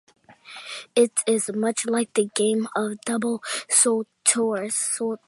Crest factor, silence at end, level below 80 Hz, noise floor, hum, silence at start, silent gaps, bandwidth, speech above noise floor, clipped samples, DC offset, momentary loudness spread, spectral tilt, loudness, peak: 22 dB; 0.1 s; -78 dBFS; -44 dBFS; none; 0.3 s; none; 12 kHz; 21 dB; under 0.1%; under 0.1%; 9 LU; -2.5 dB/octave; -22 LUFS; -2 dBFS